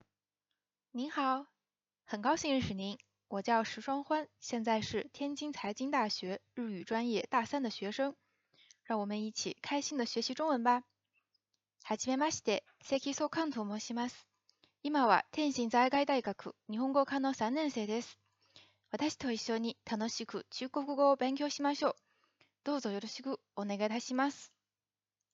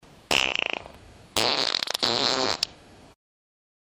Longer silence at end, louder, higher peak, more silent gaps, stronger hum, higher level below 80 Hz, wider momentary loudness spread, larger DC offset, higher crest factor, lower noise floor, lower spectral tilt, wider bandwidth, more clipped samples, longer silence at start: second, 0.85 s vs 1.25 s; second, -35 LUFS vs -24 LUFS; second, -12 dBFS vs -4 dBFS; neither; first, 50 Hz at -70 dBFS vs none; second, -76 dBFS vs -58 dBFS; first, 11 LU vs 8 LU; neither; about the same, 24 dB vs 24 dB; first, under -90 dBFS vs -50 dBFS; first, -4 dB/octave vs -1.5 dB/octave; second, 8 kHz vs over 20 kHz; neither; first, 0.95 s vs 0.3 s